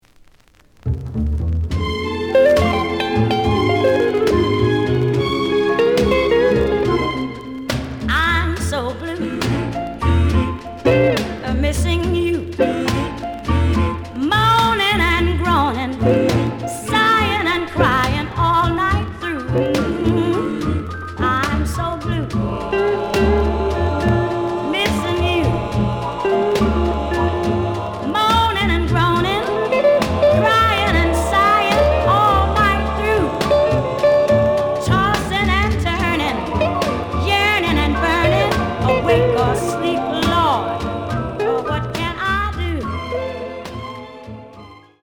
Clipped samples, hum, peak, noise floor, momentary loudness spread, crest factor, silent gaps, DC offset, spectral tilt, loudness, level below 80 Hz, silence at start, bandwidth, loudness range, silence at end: under 0.1%; none; -2 dBFS; -50 dBFS; 9 LU; 16 dB; none; under 0.1%; -6 dB/octave; -17 LUFS; -30 dBFS; 0.85 s; 19.5 kHz; 5 LU; 0.25 s